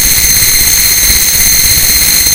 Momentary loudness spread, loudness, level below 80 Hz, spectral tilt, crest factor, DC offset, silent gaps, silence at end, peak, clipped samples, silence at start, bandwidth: 0 LU; -4 LUFS; -22 dBFS; 0.5 dB/octave; 8 dB; under 0.1%; none; 0 s; 0 dBFS; 3%; 0 s; over 20 kHz